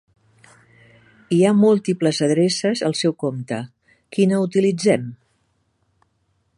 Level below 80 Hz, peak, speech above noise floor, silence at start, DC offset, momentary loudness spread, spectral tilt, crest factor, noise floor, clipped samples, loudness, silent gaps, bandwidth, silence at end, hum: -66 dBFS; -2 dBFS; 49 dB; 1.3 s; under 0.1%; 13 LU; -6 dB/octave; 18 dB; -67 dBFS; under 0.1%; -19 LUFS; none; 11.5 kHz; 1.45 s; none